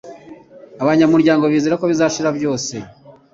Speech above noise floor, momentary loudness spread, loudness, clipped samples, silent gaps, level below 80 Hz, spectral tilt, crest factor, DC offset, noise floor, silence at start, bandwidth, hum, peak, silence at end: 25 dB; 10 LU; -16 LUFS; under 0.1%; none; -58 dBFS; -5.5 dB/octave; 14 dB; under 0.1%; -40 dBFS; 0.05 s; 7.6 kHz; none; -2 dBFS; 0.2 s